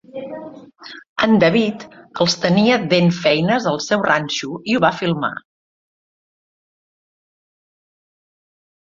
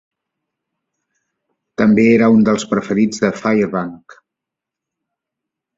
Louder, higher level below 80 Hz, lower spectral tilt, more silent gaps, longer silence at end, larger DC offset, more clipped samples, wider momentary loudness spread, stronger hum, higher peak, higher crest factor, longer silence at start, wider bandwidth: second, -17 LUFS vs -14 LUFS; about the same, -58 dBFS vs -56 dBFS; second, -5 dB/octave vs -6.5 dB/octave; first, 1.09-1.16 s vs none; first, 3.45 s vs 1.8 s; neither; neither; first, 19 LU vs 11 LU; neither; about the same, -2 dBFS vs -2 dBFS; about the same, 18 dB vs 16 dB; second, 0.15 s vs 1.8 s; about the same, 7.8 kHz vs 7.8 kHz